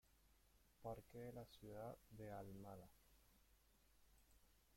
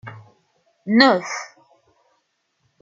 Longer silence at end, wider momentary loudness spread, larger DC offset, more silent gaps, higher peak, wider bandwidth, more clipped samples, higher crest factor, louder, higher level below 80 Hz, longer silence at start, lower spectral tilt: second, 0 s vs 1.35 s; second, 4 LU vs 25 LU; neither; neither; second, -40 dBFS vs -2 dBFS; first, 16.5 kHz vs 7.6 kHz; neither; about the same, 20 dB vs 22 dB; second, -58 LUFS vs -17 LUFS; about the same, -74 dBFS vs -70 dBFS; about the same, 0.05 s vs 0.05 s; first, -6.5 dB/octave vs -4 dB/octave